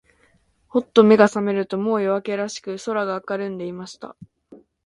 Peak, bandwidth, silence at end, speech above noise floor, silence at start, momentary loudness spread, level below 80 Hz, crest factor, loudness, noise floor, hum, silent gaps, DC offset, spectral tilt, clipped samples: 0 dBFS; 11 kHz; 0.3 s; 41 dB; 0.75 s; 19 LU; -64 dBFS; 20 dB; -20 LUFS; -61 dBFS; none; none; under 0.1%; -6 dB/octave; under 0.1%